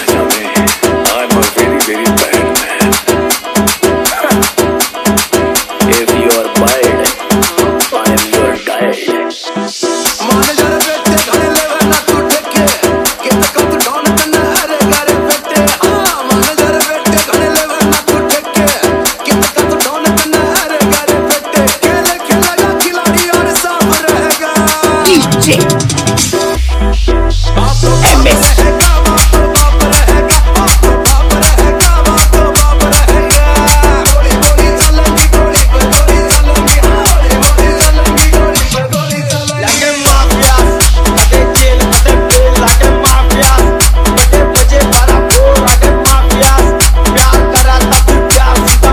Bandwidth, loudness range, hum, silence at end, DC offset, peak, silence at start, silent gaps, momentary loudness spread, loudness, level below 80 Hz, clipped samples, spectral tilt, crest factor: over 20 kHz; 3 LU; none; 0 s; under 0.1%; 0 dBFS; 0 s; none; 4 LU; -8 LUFS; -12 dBFS; 2%; -3.5 dB/octave; 8 dB